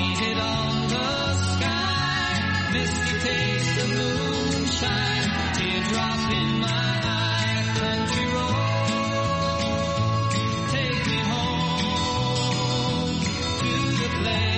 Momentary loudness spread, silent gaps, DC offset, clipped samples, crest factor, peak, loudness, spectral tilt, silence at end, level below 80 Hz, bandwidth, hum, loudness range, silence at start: 1 LU; none; under 0.1%; under 0.1%; 14 dB; -10 dBFS; -24 LUFS; -4.5 dB/octave; 0 s; -42 dBFS; 8.8 kHz; none; 1 LU; 0 s